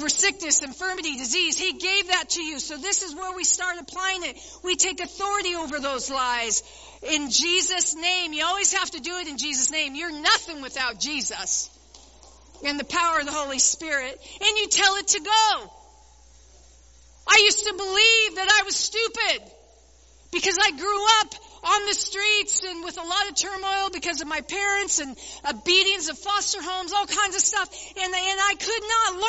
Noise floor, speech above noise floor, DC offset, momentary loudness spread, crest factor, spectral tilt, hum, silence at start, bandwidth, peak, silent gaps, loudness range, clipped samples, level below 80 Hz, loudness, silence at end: -54 dBFS; 29 dB; under 0.1%; 10 LU; 22 dB; 1 dB/octave; none; 0 s; 8.2 kHz; -2 dBFS; none; 5 LU; under 0.1%; -54 dBFS; -22 LUFS; 0 s